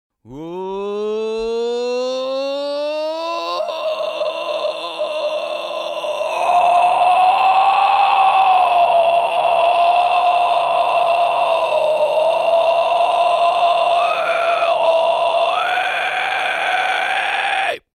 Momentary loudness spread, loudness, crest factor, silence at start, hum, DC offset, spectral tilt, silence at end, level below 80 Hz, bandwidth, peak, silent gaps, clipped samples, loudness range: 9 LU; -16 LUFS; 14 dB; 0.25 s; none; under 0.1%; -2.5 dB/octave; 0.15 s; -60 dBFS; 13.5 kHz; -4 dBFS; none; under 0.1%; 8 LU